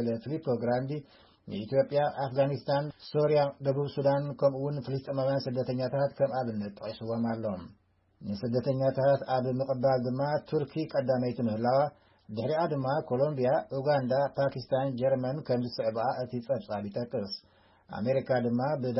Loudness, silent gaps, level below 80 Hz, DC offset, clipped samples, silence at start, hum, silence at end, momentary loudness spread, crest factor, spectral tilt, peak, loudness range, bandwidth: -30 LUFS; none; -68 dBFS; under 0.1%; under 0.1%; 0 s; none; 0 s; 9 LU; 16 dB; -10.5 dB/octave; -14 dBFS; 3 LU; 5.8 kHz